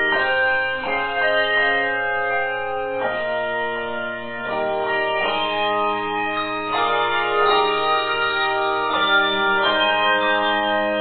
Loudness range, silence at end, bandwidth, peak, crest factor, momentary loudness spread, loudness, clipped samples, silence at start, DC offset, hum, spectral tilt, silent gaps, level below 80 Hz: 5 LU; 0 s; 4.7 kHz; -4 dBFS; 16 dB; 7 LU; -20 LUFS; under 0.1%; 0 s; under 0.1%; none; -7 dB/octave; none; -52 dBFS